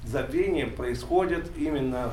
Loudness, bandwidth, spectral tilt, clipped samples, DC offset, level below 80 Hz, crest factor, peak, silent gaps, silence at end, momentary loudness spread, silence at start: -28 LUFS; 15 kHz; -6.5 dB/octave; under 0.1%; under 0.1%; -40 dBFS; 16 dB; -12 dBFS; none; 0 s; 5 LU; 0 s